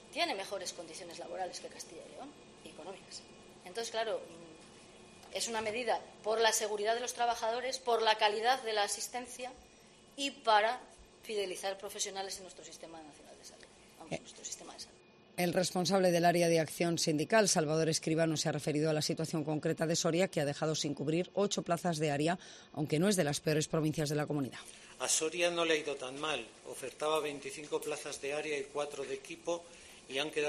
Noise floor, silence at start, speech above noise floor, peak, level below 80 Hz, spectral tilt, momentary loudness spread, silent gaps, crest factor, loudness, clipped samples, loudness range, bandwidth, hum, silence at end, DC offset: -60 dBFS; 0 s; 26 dB; -12 dBFS; -72 dBFS; -3.5 dB/octave; 20 LU; none; 22 dB; -34 LUFS; under 0.1%; 12 LU; 13 kHz; none; 0 s; under 0.1%